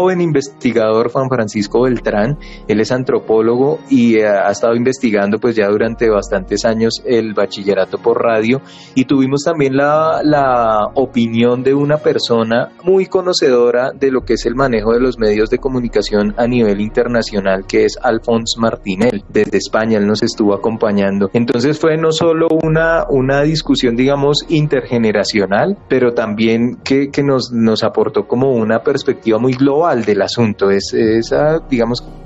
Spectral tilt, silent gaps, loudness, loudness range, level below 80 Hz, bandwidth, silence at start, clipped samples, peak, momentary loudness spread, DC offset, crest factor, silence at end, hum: -6 dB/octave; none; -14 LUFS; 2 LU; -36 dBFS; 8.2 kHz; 0 s; under 0.1%; -2 dBFS; 4 LU; under 0.1%; 10 dB; 0 s; none